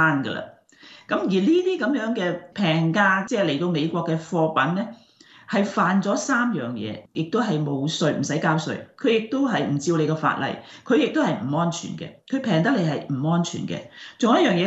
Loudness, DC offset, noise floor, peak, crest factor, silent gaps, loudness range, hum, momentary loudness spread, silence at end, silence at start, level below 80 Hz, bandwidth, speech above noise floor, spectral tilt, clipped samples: -23 LUFS; under 0.1%; -49 dBFS; -6 dBFS; 18 dB; none; 2 LU; none; 11 LU; 0 s; 0 s; -68 dBFS; 8.2 kHz; 27 dB; -5.5 dB/octave; under 0.1%